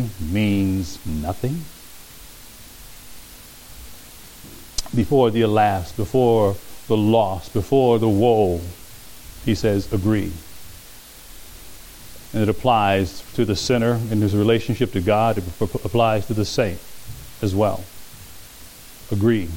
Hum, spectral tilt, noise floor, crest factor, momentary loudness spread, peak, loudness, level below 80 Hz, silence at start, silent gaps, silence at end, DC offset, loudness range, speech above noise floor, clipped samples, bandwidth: none; -6.5 dB/octave; -42 dBFS; 18 dB; 23 LU; -4 dBFS; -20 LUFS; -42 dBFS; 0 s; none; 0 s; under 0.1%; 9 LU; 23 dB; under 0.1%; 17 kHz